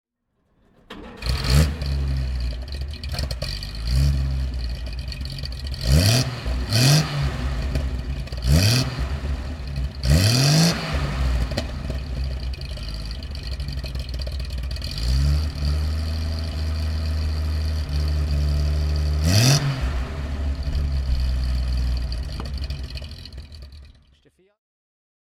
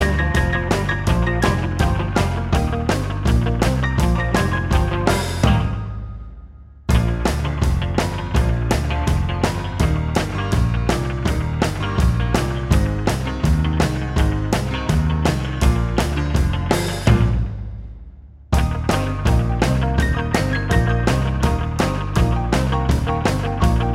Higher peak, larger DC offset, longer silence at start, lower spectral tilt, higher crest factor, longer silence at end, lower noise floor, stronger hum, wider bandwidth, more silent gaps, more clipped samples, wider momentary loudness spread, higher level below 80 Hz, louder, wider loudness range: about the same, -2 dBFS vs -2 dBFS; neither; first, 0.9 s vs 0 s; second, -4.5 dB/octave vs -6 dB/octave; about the same, 20 dB vs 18 dB; first, 1.45 s vs 0 s; first, -69 dBFS vs -40 dBFS; neither; about the same, 16 kHz vs 15 kHz; neither; neither; first, 14 LU vs 3 LU; about the same, -26 dBFS vs -24 dBFS; second, -24 LUFS vs -20 LUFS; first, 8 LU vs 2 LU